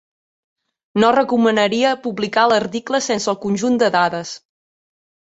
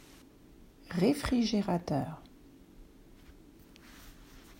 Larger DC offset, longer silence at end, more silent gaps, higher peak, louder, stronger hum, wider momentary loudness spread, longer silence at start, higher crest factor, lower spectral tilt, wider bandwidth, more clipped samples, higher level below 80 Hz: neither; first, 0.9 s vs 0.05 s; neither; first, -2 dBFS vs -16 dBFS; first, -17 LUFS vs -32 LUFS; neither; second, 8 LU vs 25 LU; first, 0.95 s vs 0.6 s; about the same, 16 dB vs 20 dB; second, -4 dB/octave vs -6 dB/octave; second, 8.2 kHz vs 16 kHz; neither; second, -60 dBFS vs -54 dBFS